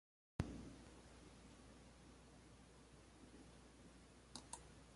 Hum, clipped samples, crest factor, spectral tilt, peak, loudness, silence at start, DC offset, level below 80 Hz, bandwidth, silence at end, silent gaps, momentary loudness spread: none; under 0.1%; 32 dB; -5 dB/octave; -26 dBFS; -58 LUFS; 0.4 s; under 0.1%; -66 dBFS; 11.5 kHz; 0 s; none; 14 LU